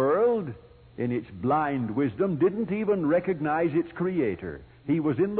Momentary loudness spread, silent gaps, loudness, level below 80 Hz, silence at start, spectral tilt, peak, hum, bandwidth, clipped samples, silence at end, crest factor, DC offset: 9 LU; none; -27 LUFS; -58 dBFS; 0 s; -12 dB/octave; -12 dBFS; none; 4.5 kHz; under 0.1%; 0 s; 14 dB; under 0.1%